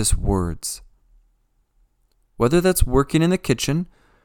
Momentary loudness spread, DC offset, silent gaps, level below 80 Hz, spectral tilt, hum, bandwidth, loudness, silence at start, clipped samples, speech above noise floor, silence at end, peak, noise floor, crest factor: 12 LU; under 0.1%; none; -30 dBFS; -5 dB/octave; none; 19 kHz; -21 LUFS; 0 s; under 0.1%; 45 dB; 0.4 s; -2 dBFS; -64 dBFS; 20 dB